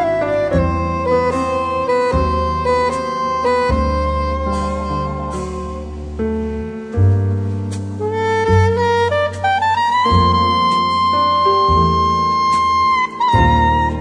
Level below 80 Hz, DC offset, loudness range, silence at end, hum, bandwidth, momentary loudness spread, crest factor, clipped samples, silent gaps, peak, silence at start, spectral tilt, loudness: -28 dBFS; under 0.1%; 6 LU; 0 s; none; 10 kHz; 10 LU; 14 dB; under 0.1%; none; -2 dBFS; 0 s; -6.5 dB/octave; -16 LUFS